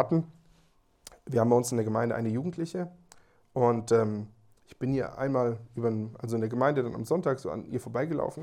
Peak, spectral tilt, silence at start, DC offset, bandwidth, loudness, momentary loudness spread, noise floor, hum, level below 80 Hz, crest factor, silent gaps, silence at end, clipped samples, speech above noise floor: -10 dBFS; -7 dB/octave; 0 s; under 0.1%; 16 kHz; -29 LUFS; 11 LU; -65 dBFS; none; -64 dBFS; 20 dB; none; 0 s; under 0.1%; 36 dB